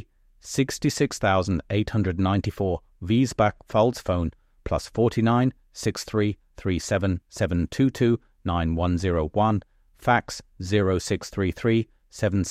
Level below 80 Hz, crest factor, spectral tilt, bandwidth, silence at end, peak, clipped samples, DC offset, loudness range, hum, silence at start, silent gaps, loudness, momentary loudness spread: -42 dBFS; 18 dB; -6 dB/octave; 15 kHz; 0 s; -6 dBFS; under 0.1%; under 0.1%; 1 LU; none; 0.45 s; none; -25 LUFS; 8 LU